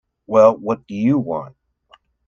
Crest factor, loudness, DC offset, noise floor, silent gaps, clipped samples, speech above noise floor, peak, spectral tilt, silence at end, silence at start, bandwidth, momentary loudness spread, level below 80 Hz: 18 dB; -18 LUFS; under 0.1%; -55 dBFS; none; under 0.1%; 38 dB; 0 dBFS; -8.5 dB/octave; 0.8 s; 0.3 s; 7 kHz; 12 LU; -60 dBFS